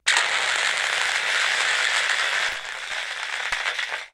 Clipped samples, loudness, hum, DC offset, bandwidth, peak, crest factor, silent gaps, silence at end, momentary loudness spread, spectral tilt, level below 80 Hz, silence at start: under 0.1%; -22 LUFS; none; under 0.1%; 16.5 kHz; 0 dBFS; 24 dB; none; 0.05 s; 8 LU; 2.5 dB/octave; -62 dBFS; 0.05 s